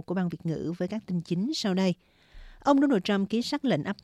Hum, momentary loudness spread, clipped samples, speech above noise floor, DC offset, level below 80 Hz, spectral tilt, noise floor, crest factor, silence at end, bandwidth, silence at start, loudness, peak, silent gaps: none; 9 LU; under 0.1%; 22 dB; under 0.1%; -58 dBFS; -6 dB/octave; -49 dBFS; 16 dB; 0.1 s; 13 kHz; 0.1 s; -28 LUFS; -12 dBFS; none